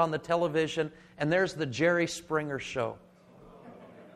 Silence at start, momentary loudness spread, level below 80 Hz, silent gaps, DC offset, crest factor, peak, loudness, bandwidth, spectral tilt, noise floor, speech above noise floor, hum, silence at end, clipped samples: 0 s; 23 LU; -64 dBFS; none; under 0.1%; 18 dB; -12 dBFS; -30 LUFS; 13.5 kHz; -5 dB/octave; -54 dBFS; 25 dB; none; 0.05 s; under 0.1%